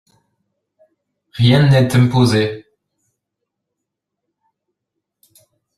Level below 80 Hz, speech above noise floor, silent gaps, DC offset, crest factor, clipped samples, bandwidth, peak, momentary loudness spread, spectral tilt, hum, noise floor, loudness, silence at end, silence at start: -50 dBFS; 67 dB; none; under 0.1%; 18 dB; under 0.1%; 13 kHz; -2 dBFS; 17 LU; -6.5 dB/octave; 50 Hz at -45 dBFS; -79 dBFS; -14 LUFS; 3.15 s; 1.35 s